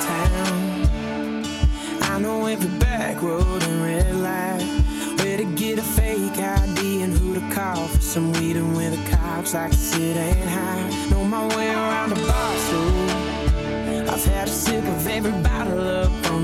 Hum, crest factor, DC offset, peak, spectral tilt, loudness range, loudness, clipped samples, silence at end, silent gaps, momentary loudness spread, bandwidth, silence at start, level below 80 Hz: none; 16 dB; under 0.1%; -4 dBFS; -5 dB/octave; 1 LU; -22 LUFS; under 0.1%; 0 s; none; 3 LU; 16.5 kHz; 0 s; -26 dBFS